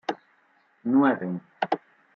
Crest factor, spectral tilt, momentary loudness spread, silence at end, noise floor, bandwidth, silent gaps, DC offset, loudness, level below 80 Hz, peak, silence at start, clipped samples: 20 dB; -7.5 dB/octave; 14 LU; 0.4 s; -64 dBFS; 6.6 kHz; none; under 0.1%; -26 LUFS; -78 dBFS; -8 dBFS; 0.1 s; under 0.1%